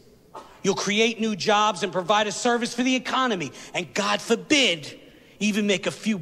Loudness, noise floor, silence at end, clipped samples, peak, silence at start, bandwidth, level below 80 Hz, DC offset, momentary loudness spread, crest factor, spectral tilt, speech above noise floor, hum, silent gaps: -23 LUFS; -45 dBFS; 0 s; under 0.1%; -6 dBFS; 0.35 s; 14.5 kHz; -64 dBFS; under 0.1%; 8 LU; 20 dB; -3 dB/octave; 22 dB; none; none